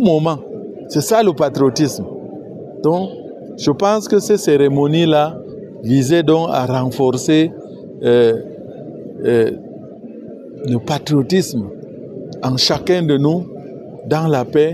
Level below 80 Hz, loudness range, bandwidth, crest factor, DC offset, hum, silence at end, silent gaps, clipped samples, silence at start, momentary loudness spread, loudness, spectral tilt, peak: -54 dBFS; 5 LU; 14.5 kHz; 14 dB; under 0.1%; none; 0 s; none; under 0.1%; 0 s; 19 LU; -16 LUFS; -6 dB/octave; -2 dBFS